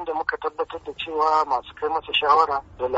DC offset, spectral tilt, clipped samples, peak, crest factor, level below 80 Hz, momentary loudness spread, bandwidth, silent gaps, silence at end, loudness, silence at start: under 0.1%; 0.5 dB/octave; under 0.1%; -6 dBFS; 18 dB; -54 dBFS; 11 LU; 8 kHz; none; 0 s; -23 LUFS; 0 s